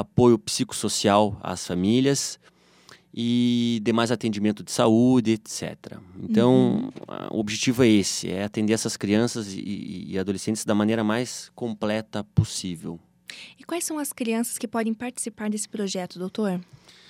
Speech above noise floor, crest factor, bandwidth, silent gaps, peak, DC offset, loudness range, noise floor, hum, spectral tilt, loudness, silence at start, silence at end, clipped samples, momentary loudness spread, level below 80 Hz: 29 dB; 20 dB; 16 kHz; none; -4 dBFS; under 0.1%; 6 LU; -53 dBFS; none; -5 dB/octave; -24 LUFS; 0 s; 0.45 s; under 0.1%; 14 LU; -58 dBFS